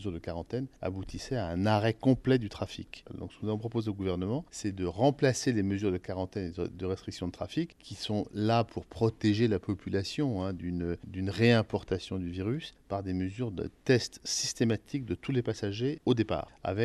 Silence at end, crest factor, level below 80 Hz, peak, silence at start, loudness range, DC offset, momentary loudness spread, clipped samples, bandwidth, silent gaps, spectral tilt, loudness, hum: 0 s; 20 dB; -56 dBFS; -12 dBFS; 0 s; 2 LU; under 0.1%; 10 LU; under 0.1%; 12.5 kHz; none; -6 dB/octave; -32 LUFS; none